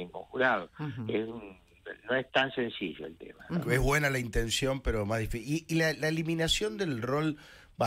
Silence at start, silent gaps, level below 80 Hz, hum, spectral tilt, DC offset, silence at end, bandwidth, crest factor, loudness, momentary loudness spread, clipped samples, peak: 0 s; none; -44 dBFS; none; -4.5 dB/octave; under 0.1%; 0 s; 16 kHz; 18 dB; -31 LUFS; 17 LU; under 0.1%; -12 dBFS